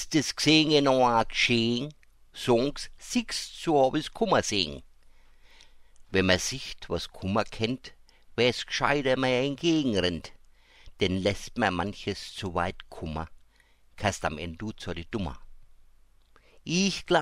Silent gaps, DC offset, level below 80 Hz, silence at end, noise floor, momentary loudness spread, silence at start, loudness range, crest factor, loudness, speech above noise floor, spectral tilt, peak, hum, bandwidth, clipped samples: none; under 0.1%; -48 dBFS; 0 s; -60 dBFS; 14 LU; 0 s; 8 LU; 22 dB; -27 LUFS; 33 dB; -4 dB/octave; -6 dBFS; none; 16 kHz; under 0.1%